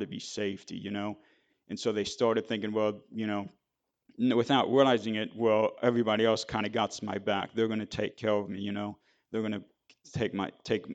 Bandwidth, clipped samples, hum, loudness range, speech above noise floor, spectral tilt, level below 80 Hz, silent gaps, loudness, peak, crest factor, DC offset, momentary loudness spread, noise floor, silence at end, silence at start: 9 kHz; under 0.1%; none; 6 LU; 55 dB; -5.5 dB/octave; -68 dBFS; none; -30 LUFS; -10 dBFS; 22 dB; under 0.1%; 12 LU; -85 dBFS; 0 s; 0 s